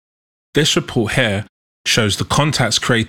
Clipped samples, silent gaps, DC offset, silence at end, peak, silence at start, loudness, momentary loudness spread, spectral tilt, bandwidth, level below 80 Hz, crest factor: under 0.1%; 1.49-1.85 s; 0.4%; 0 s; 0 dBFS; 0.55 s; -16 LUFS; 6 LU; -3.5 dB/octave; 18 kHz; -42 dBFS; 18 dB